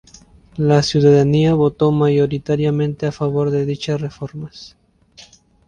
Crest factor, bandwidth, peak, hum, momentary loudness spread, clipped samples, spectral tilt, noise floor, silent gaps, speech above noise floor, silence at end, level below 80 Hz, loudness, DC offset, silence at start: 16 dB; 9.4 kHz; -2 dBFS; none; 16 LU; under 0.1%; -7 dB/octave; -47 dBFS; none; 31 dB; 0.45 s; -46 dBFS; -16 LUFS; under 0.1%; 0.55 s